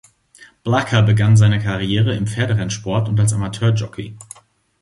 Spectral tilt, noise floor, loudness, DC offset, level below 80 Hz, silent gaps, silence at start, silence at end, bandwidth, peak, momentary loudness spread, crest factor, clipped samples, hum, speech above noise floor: -6 dB/octave; -43 dBFS; -17 LUFS; under 0.1%; -42 dBFS; none; 0.4 s; 0.6 s; 11.5 kHz; -2 dBFS; 17 LU; 14 dB; under 0.1%; none; 27 dB